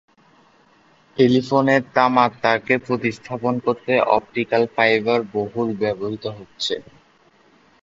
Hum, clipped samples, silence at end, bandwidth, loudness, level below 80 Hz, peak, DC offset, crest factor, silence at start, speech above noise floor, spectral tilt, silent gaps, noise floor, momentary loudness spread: none; under 0.1%; 1.05 s; 7.8 kHz; -20 LUFS; -60 dBFS; 0 dBFS; under 0.1%; 20 dB; 1.15 s; 36 dB; -6 dB/octave; none; -56 dBFS; 10 LU